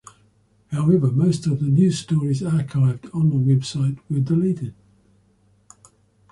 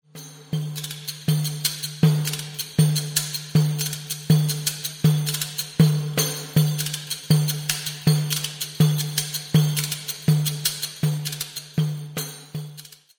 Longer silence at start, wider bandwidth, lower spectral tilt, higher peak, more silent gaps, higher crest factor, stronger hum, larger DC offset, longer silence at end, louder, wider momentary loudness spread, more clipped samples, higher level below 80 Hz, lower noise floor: first, 0.7 s vs 0.15 s; second, 11 kHz vs over 20 kHz; first, -8 dB/octave vs -4.5 dB/octave; about the same, -6 dBFS vs -4 dBFS; neither; about the same, 16 dB vs 18 dB; neither; neither; first, 1.6 s vs 0.3 s; about the same, -21 LUFS vs -23 LUFS; second, 7 LU vs 10 LU; neither; about the same, -54 dBFS vs -56 dBFS; first, -59 dBFS vs -44 dBFS